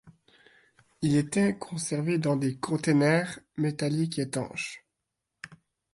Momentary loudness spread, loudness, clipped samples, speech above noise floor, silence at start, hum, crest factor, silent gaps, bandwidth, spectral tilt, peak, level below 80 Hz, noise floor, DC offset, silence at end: 19 LU; -28 LUFS; under 0.1%; 57 dB; 0.05 s; none; 18 dB; none; 11.5 kHz; -6 dB/octave; -12 dBFS; -66 dBFS; -84 dBFS; under 0.1%; 0.4 s